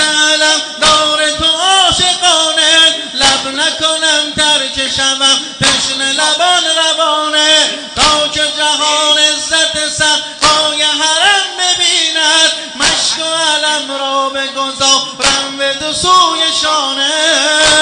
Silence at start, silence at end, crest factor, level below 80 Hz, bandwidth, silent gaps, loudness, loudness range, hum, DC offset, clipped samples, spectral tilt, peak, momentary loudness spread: 0 s; 0 s; 12 dB; -42 dBFS; 12 kHz; none; -9 LUFS; 3 LU; none; under 0.1%; under 0.1%; 0 dB/octave; 0 dBFS; 5 LU